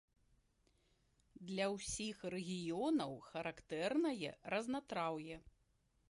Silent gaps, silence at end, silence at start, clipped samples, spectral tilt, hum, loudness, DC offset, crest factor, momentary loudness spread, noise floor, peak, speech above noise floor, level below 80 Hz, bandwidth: none; 0.65 s; 1.4 s; under 0.1%; -4.5 dB/octave; none; -42 LUFS; under 0.1%; 16 dB; 9 LU; -78 dBFS; -28 dBFS; 36 dB; -70 dBFS; 11.5 kHz